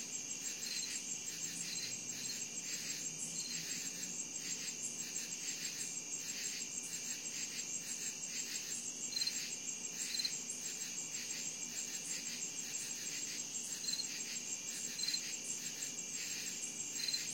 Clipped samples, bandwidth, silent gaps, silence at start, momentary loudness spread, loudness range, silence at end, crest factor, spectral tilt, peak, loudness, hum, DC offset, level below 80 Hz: under 0.1%; 16.5 kHz; none; 0 s; 4 LU; 1 LU; 0 s; 18 dB; 0.5 dB/octave; -24 dBFS; -40 LUFS; none; under 0.1%; -84 dBFS